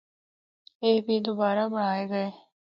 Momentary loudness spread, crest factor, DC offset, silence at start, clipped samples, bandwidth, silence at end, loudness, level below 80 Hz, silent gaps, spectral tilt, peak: 6 LU; 18 dB; under 0.1%; 0.8 s; under 0.1%; 5.8 kHz; 0.45 s; -27 LUFS; -78 dBFS; none; -8.5 dB/octave; -12 dBFS